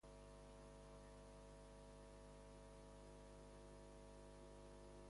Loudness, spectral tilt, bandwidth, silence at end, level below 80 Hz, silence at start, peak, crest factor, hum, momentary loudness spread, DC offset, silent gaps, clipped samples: -62 LUFS; -5.5 dB/octave; 11.5 kHz; 0 s; -66 dBFS; 0.05 s; -50 dBFS; 10 dB; 50 Hz at -65 dBFS; 1 LU; under 0.1%; none; under 0.1%